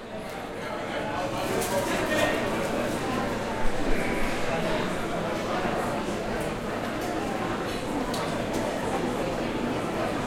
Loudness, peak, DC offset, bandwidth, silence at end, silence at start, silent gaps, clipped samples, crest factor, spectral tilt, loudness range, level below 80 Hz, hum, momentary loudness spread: -29 LUFS; -10 dBFS; under 0.1%; 16.5 kHz; 0 s; 0 s; none; under 0.1%; 16 dB; -4.5 dB/octave; 2 LU; -40 dBFS; none; 4 LU